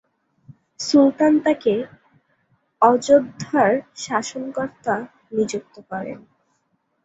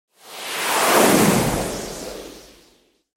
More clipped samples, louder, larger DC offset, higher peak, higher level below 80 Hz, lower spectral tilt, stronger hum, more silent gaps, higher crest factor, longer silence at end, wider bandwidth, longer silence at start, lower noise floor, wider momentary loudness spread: neither; about the same, -20 LUFS vs -18 LUFS; neither; about the same, -2 dBFS vs -2 dBFS; second, -64 dBFS vs -44 dBFS; first, -5 dB/octave vs -3.5 dB/octave; neither; neither; about the same, 20 dB vs 18 dB; about the same, 0.85 s vs 0.75 s; second, 8 kHz vs 17 kHz; first, 0.8 s vs 0.25 s; first, -69 dBFS vs -58 dBFS; second, 15 LU vs 21 LU